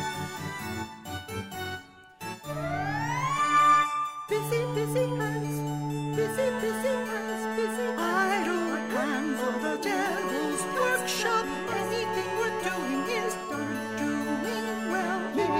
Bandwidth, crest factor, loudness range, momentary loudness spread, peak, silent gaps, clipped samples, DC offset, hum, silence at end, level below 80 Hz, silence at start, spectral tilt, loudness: 16 kHz; 16 dB; 4 LU; 9 LU; -12 dBFS; none; under 0.1%; 0.1%; none; 0 s; -62 dBFS; 0 s; -4.5 dB/octave; -29 LUFS